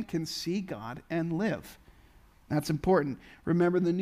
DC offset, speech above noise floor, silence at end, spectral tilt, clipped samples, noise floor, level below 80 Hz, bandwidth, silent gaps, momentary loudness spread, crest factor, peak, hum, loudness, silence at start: under 0.1%; 28 dB; 0 s; -6.5 dB/octave; under 0.1%; -58 dBFS; -56 dBFS; 15.5 kHz; none; 13 LU; 18 dB; -12 dBFS; none; -31 LUFS; 0 s